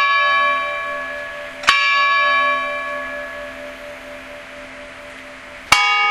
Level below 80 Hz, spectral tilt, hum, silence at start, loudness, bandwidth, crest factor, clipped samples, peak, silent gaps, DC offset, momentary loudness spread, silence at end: -50 dBFS; -0.5 dB/octave; none; 0 s; -16 LUFS; 16 kHz; 20 dB; under 0.1%; 0 dBFS; none; under 0.1%; 21 LU; 0 s